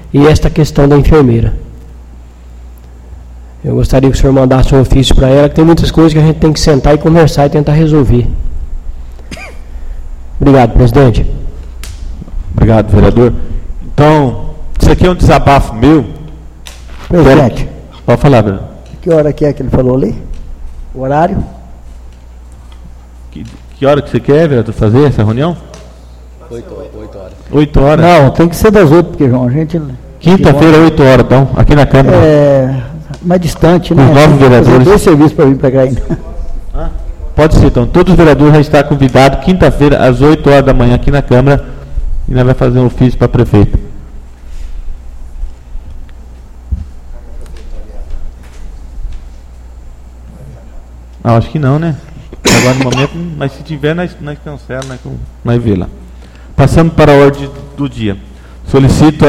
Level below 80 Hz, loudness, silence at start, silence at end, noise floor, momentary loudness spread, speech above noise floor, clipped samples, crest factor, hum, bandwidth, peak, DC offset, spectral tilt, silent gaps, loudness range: -18 dBFS; -8 LUFS; 0.05 s; 0 s; -31 dBFS; 22 LU; 25 dB; 2%; 8 dB; none; 15 kHz; 0 dBFS; under 0.1%; -7 dB/octave; none; 10 LU